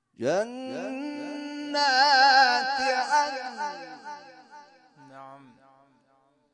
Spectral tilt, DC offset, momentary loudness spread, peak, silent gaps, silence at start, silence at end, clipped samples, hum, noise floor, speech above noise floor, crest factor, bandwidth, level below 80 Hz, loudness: -2 dB/octave; under 0.1%; 22 LU; -8 dBFS; none; 0.2 s; 1.15 s; under 0.1%; none; -66 dBFS; 43 dB; 20 dB; 10.5 kHz; -78 dBFS; -24 LUFS